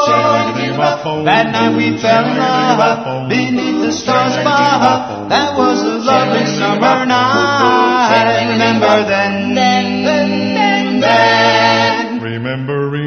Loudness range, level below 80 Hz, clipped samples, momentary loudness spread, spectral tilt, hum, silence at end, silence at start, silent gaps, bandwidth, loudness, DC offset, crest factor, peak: 2 LU; -52 dBFS; under 0.1%; 6 LU; -5 dB/octave; none; 0 s; 0 s; none; 6.6 kHz; -12 LUFS; under 0.1%; 12 dB; 0 dBFS